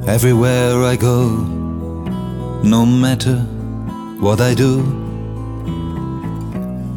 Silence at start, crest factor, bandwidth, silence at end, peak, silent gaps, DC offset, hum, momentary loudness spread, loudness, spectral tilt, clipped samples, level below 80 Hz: 0 s; 14 dB; 17.5 kHz; 0 s; 0 dBFS; none; under 0.1%; none; 12 LU; -17 LUFS; -6.5 dB/octave; under 0.1%; -34 dBFS